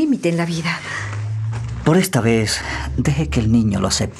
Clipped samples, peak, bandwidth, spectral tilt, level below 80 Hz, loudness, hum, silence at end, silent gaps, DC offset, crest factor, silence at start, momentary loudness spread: under 0.1%; -2 dBFS; 13.5 kHz; -5.5 dB/octave; -34 dBFS; -19 LUFS; none; 0 s; none; under 0.1%; 18 dB; 0 s; 8 LU